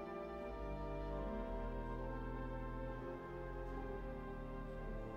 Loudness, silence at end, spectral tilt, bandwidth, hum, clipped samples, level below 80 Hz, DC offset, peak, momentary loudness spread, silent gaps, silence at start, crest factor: -47 LUFS; 0 s; -8.5 dB/octave; 6.2 kHz; none; under 0.1%; -48 dBFS; under 0.1%; -34 dBFS; 4 LU; none; 0 s; 12 dB